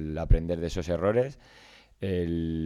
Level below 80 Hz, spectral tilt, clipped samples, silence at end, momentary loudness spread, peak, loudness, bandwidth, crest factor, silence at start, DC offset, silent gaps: -34 dBFS; -7.5 dB/octave; under 0.1%; 0 s; 6 LU; -8 dBFS; -29 LUFS; 10 kHz; 20 dB; 0 s; under 0.1%; none